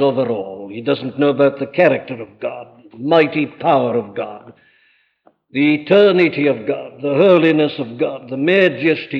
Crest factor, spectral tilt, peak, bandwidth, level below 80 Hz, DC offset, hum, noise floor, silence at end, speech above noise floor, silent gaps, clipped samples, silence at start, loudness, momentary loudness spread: 16 dB; -8.5 dB/octave; -2 dBFS; 6 kHz; -66 dBFS; under 0.1%; none; -58 dBFS; 0 s; 42 dB; none; under 0.1%; 0 s; -16 LUFS; 15 LU